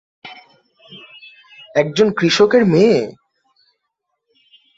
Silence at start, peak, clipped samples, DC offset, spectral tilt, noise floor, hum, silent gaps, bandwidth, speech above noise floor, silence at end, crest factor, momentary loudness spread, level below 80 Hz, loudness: 0.25 s; -2 dBFS; under 0.1%; under 0.1%; -5.5 dB/octave; -75 dBFS; none; none; 7.8 kHz; 61 dB; 1.65 s; 18 dB; 25 LU; -58 dBFS; -14 LUFS